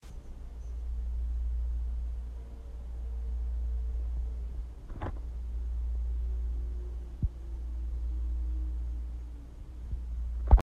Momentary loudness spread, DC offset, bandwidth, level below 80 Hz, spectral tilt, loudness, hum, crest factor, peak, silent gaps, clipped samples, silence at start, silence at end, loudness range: 9 LU; under 0.1%; 2.3 kHz; -32 dBFS; -8.5 dB/octave; -38 LUFS; none; 26 dB; -6 dBFS; none; under 0.1%; 0.05 s; 0 s; 2 LU